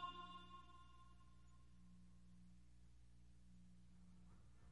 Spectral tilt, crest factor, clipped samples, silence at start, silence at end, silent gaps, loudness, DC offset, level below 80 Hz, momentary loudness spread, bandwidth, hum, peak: -5 dB/octave; 22 dB; under 0.1%; 0 s; 0 s; none; -64 LUFS; under 0.1%; -70 dBFS; 11 LU; 10.5 kHz; 60 Hz at -70 dBFS; -40 dBFS